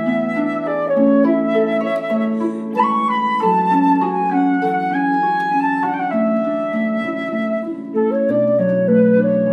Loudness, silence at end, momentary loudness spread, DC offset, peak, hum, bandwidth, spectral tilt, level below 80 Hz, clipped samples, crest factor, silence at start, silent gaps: -17 LUFS; 0 s; 7 LU; under 0.1%; -4 dBFS; none; 8.2 kHz; -8.5 dB/octave; -70 dBFS; under 0.1%; 14 dB; 0 s; none